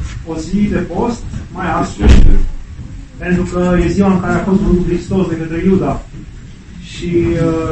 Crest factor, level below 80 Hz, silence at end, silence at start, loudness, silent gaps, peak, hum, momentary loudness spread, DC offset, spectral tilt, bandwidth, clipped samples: 12 dB; -16 dBFS; 0 s; 0 s; -15 LUFS; none; 0 dBFS; none; 19 LU; 0.6%; -7.5 dB/octave; 8.6 kHz; 1%